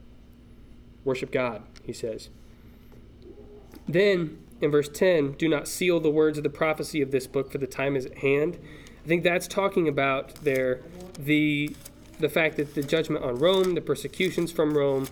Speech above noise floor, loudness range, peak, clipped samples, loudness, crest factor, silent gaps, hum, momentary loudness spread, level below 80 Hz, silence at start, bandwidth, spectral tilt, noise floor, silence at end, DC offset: 24 dB; 6 LU; -10 dBFS; under 0.1%; -26 LUFS; 18 dB; none; none; 12 LU; -52 dBFS; 0.1 s; 19.5 kHz; -5.5 dB/octave; -50 dBFS; 0 s; under 0.1%